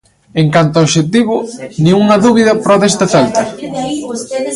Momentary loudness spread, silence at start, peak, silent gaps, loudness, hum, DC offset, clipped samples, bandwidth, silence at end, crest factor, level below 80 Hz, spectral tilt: 12 LU; 0.35 s; 0 dBFS; none; -11 LUFS; none; under 0.1%; under 0.1%; 11.5 kHz; 0 s; 12 dB; -46 dBFS; -5.5 dB/octave